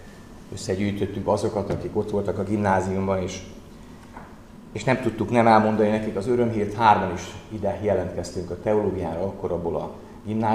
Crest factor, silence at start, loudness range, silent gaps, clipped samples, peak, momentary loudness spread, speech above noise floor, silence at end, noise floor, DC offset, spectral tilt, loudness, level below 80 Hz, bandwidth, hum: 22 dB; 0 s; 5 LU; none; under 0.1%; -2 dBFS; 21 LU; 20 dB; 0 s; -44 dBFS; 0.1%; -6.5 dB/octave; -24 LUFS; -48 dBFS; 13.5 kHz; none